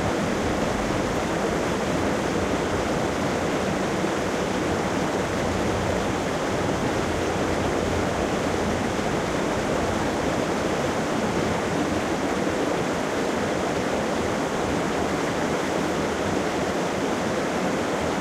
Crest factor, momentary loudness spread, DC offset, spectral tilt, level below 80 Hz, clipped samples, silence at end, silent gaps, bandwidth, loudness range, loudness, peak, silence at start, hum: 14 dB; 1 LU; under 0.1%; -5 dB/octave; -42 dBFS; under 0.1%; 0 s; none; 16 kHz; 0 LU; -25 LUFS; -10 dBFS; 0 s; none